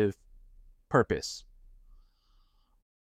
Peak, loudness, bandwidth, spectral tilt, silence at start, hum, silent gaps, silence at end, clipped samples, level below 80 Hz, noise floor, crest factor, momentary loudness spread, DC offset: -10 dBFS; -30 LUFS; 15 kHz; -5.5 dB/octave; 0 s; none; none; 1.65 s; under 0.1%; -56 dBFS; -66 dBFS; 24 dB; 18 LU; under 0.1%